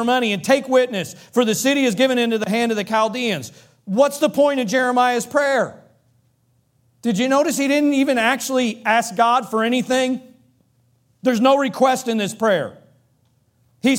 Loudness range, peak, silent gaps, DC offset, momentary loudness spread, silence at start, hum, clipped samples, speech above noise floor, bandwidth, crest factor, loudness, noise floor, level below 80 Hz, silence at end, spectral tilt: 2 LU; -2 dBFS; none; under 0.1%; 7 LU; 0 s; none; under 0.1%; 44 dB; 17 kHz; 16 dB; -19 LUFS; -63 dBFS; -68 dBFS; 0 s; -4 dB/octave